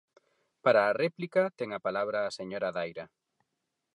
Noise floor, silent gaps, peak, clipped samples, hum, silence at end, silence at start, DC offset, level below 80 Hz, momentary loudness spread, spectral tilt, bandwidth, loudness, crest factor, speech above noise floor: -84 dBFS; none; -12 dBFS; under 0.1%; none; 0.9 s; 0.65 s; under 0.1%; -76 dBFS; 12 LU; -5.5 dB/octave; 11 kHz; -30 LUFS; 20 dB; 54 dB